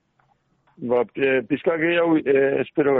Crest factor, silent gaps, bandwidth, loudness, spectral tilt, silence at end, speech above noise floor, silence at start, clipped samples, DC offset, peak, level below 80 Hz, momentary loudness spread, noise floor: 14 dB; none; 4 kHz; -21 LUFS; -4.5 dB/octave; 0 s; 45 dB; 0.8 s; under 0.1%; under 0.1%; -8 dBFS; -64 dBFS; 5 LU; -65 dBFS